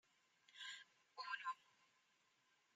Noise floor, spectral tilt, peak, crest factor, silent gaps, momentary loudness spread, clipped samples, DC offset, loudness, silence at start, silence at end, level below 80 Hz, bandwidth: -81 dBFS; 2 dB/octave; -34 dBFS; 22 dB; none; 13 LU; under 0.1%; under 0.1%; -52 LUFS; 0.5 s; 0.9 s; under -90 dBFS; 11 kHz